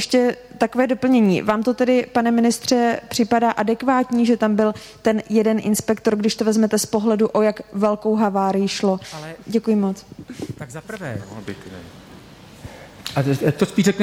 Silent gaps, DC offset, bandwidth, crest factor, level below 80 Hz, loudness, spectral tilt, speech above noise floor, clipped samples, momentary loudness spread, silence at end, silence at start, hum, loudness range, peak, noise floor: none; under 0.1%; 15.5 kHz; 14 dB; -54 dBFS; -19 LUFS; -5.5 dB/octave; 23 dB; under 0.1%; 16 LU; 0 s; 0 s; none; 9 LU; -6 dBFS; -42 dBFS